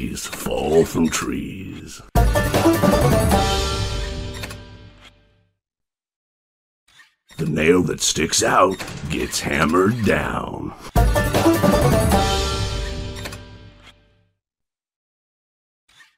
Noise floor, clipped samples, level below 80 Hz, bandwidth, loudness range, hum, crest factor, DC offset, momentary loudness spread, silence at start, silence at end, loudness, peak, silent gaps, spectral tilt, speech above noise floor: -86 dBFS; under 0.1%; -30 dBFS; 16 kHz; 15 LU; none; 18 dB; under 0.1%; 15 LU; 0 s; 2.3 s; -19 LUFS; -2 dBFS; 6.16-6.87 s; -4.5 dB/octave; 67 dB